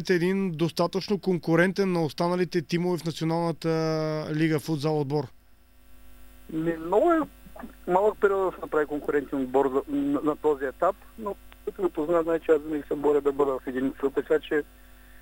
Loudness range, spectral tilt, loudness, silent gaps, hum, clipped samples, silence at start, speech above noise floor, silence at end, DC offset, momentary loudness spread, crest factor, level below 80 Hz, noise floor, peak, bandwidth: 3 LU; -7 dB/octave; -26 LUFS; none; none; under 0.1%; 0 s; 29 dB; 0.05 s; under 0.1%; 7 LU; 20 dB; -54 dBFS; -55 dBFS; -6 dBFS; 16 kHz